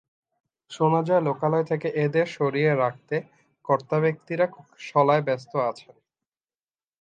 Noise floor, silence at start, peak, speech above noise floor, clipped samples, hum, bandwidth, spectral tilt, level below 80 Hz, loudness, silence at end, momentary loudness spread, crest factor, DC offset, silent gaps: under -90 dBFS; 0.7 s; -6 dBFS; over 66 dB; under 0.1%; none; 9 kHz; -7.5 dB/octave; -74 dBFS; -24 LUFS; 1.2 s; 10 LU; 18 dB; under 0.1%; none